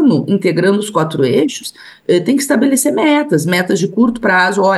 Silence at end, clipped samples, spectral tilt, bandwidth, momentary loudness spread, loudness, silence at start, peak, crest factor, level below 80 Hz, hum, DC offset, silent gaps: 0 s; under 0.1%; -5 dB/octave; 12.5 kHz; 5 LU; -13 LUFS; 0 s; -2 dBFS; 12 dB; -54 dBFS; none; under 0.1%; none